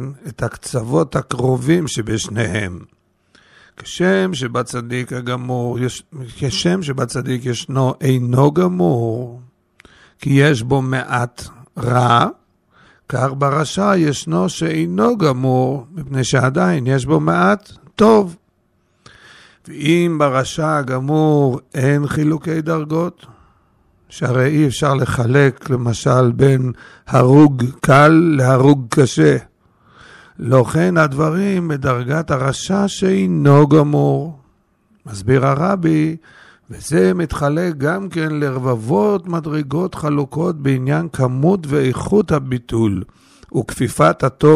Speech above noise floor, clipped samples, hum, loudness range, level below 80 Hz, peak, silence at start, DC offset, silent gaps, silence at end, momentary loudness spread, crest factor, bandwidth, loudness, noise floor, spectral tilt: 46 dB; under 0.1%; none; 7 LU; -46 dBFS; -2 dBFS; 0 s; under 0.1%; none; 0 s; 11 LU; 14 dB; 13 kHz; -16 LUFS; -61 dBFS; -6.5 dB/octave